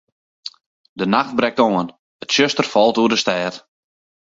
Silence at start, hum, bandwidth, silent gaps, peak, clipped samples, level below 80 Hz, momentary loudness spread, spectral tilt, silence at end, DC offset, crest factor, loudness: 0.45 s; none; 7.8 kHz; 0.66-0.96 s, 1.99-2.20 s; 0 dBFS; under 0.1%; -62 dBFS; 19 LU; -4 dB/octave; 0.75 s; under 0.1%; 20 dB; -17 LUFS